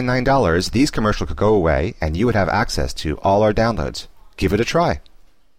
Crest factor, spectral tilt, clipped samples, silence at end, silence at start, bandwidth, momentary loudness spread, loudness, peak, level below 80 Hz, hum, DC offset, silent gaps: 12 dB; -6 dB/octave; under 0.1%; 0.55 s; 0 s; 16 kHz; 8 LU; -19 LUFS; -6 dBFS; -30 dBFS; none; 0.6%; none